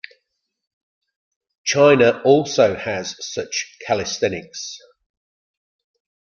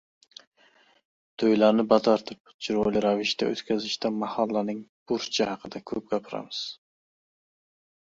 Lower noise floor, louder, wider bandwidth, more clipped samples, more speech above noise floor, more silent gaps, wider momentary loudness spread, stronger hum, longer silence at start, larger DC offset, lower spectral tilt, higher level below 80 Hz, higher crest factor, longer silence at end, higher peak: first, -75 dBFS vs -61 dBFS; first, -18 LUFS vs -26 LUFS; about the same, 7.2 kHz vs 7.6 kHz; neither; first, 57 dB vs 35 dB; second, none vs 2.40-2.44 s, 2.54-2.59 s, 4.89-5.06 s; about the same, 17 LU vs 15 LU; neither; first, 1.65 s vs 1.4 s; neither; about the same, -4 dB/octave vs -5 dB/octave; about the same, -62 dBFS vs -64 dBFS; about the same, 20 dB vs 22 dB; first, 1.6 s vs 1.4 s; first, -2 dBFS vs -6 dBFS